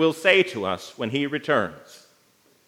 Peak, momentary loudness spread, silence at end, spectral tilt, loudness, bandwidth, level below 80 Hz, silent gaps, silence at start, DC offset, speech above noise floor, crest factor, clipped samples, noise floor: -2 dBFS; 11 LU; 0.7 s; -4.5 dB/octave; -23 LUFS; 16 kHz; -72 dBFS; none; 0 s; under 0.1%; 38 dB; 22 dB; under 0.1%; -61 dBFS